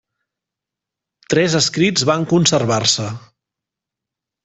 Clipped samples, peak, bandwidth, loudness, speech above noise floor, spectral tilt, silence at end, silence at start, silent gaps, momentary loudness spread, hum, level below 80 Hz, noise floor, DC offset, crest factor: under 0.1%; 0 dBFS; 8.4 kHz; -15 LUFS; 69 dB; -4 dB/octave; 1.25 s; 1.3 s; none; 6 LU; none; -56 dBFS; -85 dBFS; under 0.1%; 20 dB